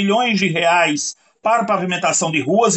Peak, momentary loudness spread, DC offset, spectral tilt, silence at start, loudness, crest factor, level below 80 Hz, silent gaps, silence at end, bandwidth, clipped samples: -4 dBFS; 7 LU; under 0.1%; -3.5 dB/octave; 0 s; -17 LUFS; 14 dB; -64 dBFS; none; 0 s; 9 kHz; under 0.1%